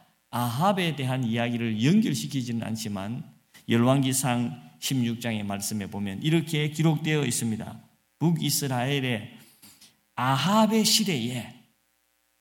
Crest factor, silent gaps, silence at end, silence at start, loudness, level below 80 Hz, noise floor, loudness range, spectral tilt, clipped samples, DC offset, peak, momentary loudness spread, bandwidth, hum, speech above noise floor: 18 dB; none; 0.85 s; 0.3 s; -26 LUFS; -68 dBFS; -71 dBFS; 2 LU; -4.5 dB/octave; under 0.1%; under 0.1%; -8 dBFS; 12 LU; 17.5 kHz; none; 45 dB